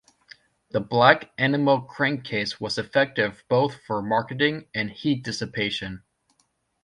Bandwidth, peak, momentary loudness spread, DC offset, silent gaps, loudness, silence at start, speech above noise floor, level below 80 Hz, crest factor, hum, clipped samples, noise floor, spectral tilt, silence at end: 11 kHz; -2 dBFS; 11 LU; under 0.1%; none; -24 LUFS; 0.75 s; 46 dB; -60 dBFS; 24 dB; none; under 0.1%; -70 dBFS; -5.5 dB/octave; 0.85 s